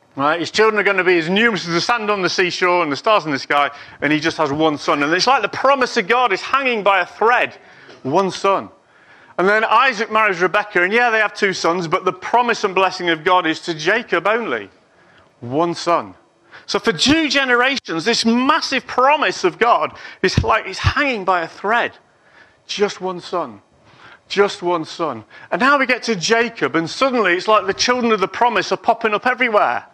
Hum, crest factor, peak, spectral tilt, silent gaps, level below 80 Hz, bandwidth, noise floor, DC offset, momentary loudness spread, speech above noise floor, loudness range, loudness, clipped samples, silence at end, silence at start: none; 16 dB; -2 dBFS; -4 dB/octave; none; -46 dBFS; 12.5 kHz; -51 dBFS; under 0.1%; 7 LU; 34 dB; 5 LU; -17 LUFS; under 0.1%; 0.1 s; 0.15 s